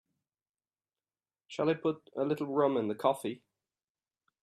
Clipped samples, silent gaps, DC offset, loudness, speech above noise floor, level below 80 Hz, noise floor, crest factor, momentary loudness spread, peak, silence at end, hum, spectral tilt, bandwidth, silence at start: under 0.1%; none; under 0.1%; -32 LUFS; over 59 dB; -80 dBFS; under -90 dBFS; 22 dB; 11 LU; -14 dBFS; 1.05 s; none; -6.5 dB/octave; 13 kHz; 1.5 s